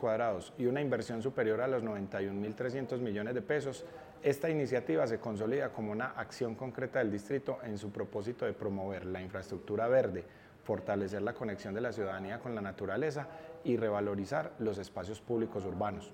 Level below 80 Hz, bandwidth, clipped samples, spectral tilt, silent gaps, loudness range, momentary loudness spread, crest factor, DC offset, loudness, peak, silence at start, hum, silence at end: -70 dBFS; 16.5 kHz; under 0.1%; -7 dB/octave; none; 3 LU; 8 LU; 18 dB; under 0.1%; -36 LUFS; -18 dBFS; 0 s; none; 0 s